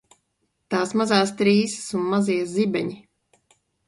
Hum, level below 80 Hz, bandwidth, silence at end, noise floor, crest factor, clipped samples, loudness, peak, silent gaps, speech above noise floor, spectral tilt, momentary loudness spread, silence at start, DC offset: none; -66 dBFS; 11.5 kHz; 0.9 s; -73 dBFS; 18 dB; under 0.1%; -22 LUFS; -4 dBFS; none; 52 dB; -5 dB/octave; 8 LU; 0.7 s; under 0.1%